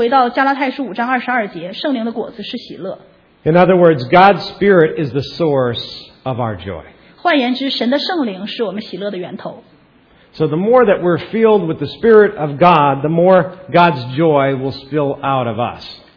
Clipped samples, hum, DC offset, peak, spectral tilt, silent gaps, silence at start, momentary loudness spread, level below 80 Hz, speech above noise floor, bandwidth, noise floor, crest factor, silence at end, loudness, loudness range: 0.1%; none; under 0.1%; 0 dBFS; -8 dB/octave; none; 0 s; 16 LU; -50 dBFS; 35 dB; 5.4 kHz; -49 dBFS; 14 dB; 0.2 s; -14 LUFS; 7 LU